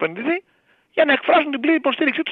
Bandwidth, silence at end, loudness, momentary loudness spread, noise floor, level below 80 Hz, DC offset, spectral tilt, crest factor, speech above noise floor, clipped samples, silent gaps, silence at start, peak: 4.6 kHz; 0 s; -19 LUFS; 9 LU; -39 dBFS; -74 dBFS; under 0.1%; -6.5 dB/octave; 18 dB; 21 dB; under 0.1%; none; 0 s; -2 dBFS